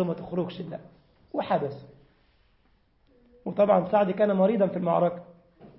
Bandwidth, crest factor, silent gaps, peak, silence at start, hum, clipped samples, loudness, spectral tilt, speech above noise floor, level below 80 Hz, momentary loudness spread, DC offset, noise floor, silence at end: 5.8 kHz; 18 dB; none; -8 dBFS; 0 s; none; under 0.1%; -26 LUFS; -11.5 dB/octave; 40 dB; -66 dBFS; 17 LU; under 0.1%; -65 dBFS; 0.1 s